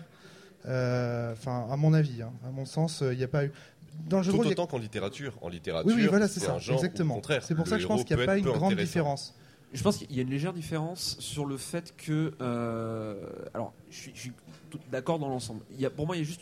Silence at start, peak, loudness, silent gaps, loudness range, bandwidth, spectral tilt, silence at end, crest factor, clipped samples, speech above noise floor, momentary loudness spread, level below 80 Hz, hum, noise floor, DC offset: 0 s; -12 dBFS; -30 LUFS; none; 8 LU; 15 kHz; -6 dB/octave; 0 s; 18 dB; under 0.1%; 23 dB; 15 LU; -58 dBFS; none; -53 dBFS; under 0.1%